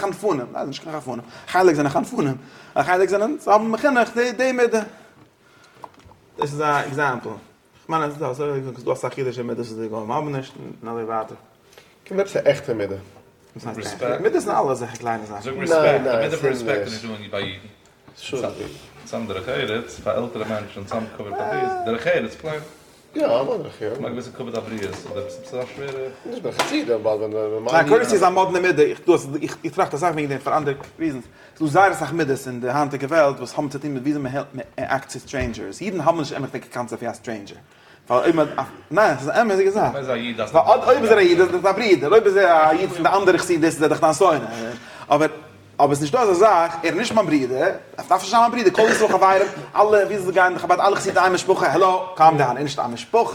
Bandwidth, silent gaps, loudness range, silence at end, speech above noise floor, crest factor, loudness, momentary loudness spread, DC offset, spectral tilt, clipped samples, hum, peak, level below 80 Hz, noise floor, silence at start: 17.5 kHz; none; 10 LU; 0 s; 32 dB; 20 dB; -20 LUFS; 15 LU; under 0.1%; -5 dB/octave; under 0.1%; none; 0 dBFS; -56 dBFS; -52 dBFS; 0 s